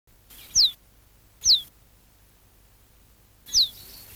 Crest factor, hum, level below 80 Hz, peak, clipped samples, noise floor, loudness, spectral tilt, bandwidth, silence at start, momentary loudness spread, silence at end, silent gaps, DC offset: 18 dB; none; -54 dBFS; -10 dBFS; under 0.1%; -57 dBFS; -21 LUFS; 2 dB/octave; over 20 kHz; 0.55 s; 5 LU; 0.45 s; none; under 0.1%